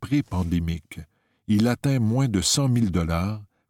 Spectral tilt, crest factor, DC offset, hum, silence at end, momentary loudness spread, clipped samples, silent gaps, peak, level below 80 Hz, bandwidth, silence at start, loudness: -5 dB/octave; 16 dB; under 0.1%; none; 0.25 s; 13 LU; under 0.1%; none; -8 dBFS; -42 dBFS; 17 kHz; 0 s; -23 LUFS